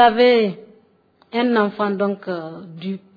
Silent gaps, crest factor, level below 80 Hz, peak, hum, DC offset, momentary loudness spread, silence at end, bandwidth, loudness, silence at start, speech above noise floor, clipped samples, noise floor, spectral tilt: none; 16 dB; -62 dBFS; -2 dBFS; none; under 0.1%; 16 LU; 0.2 s; 5 kHz; -19 LUFS; 0 s; 39 dB; under 0.1%; -57 dBFS; -8 dB/octave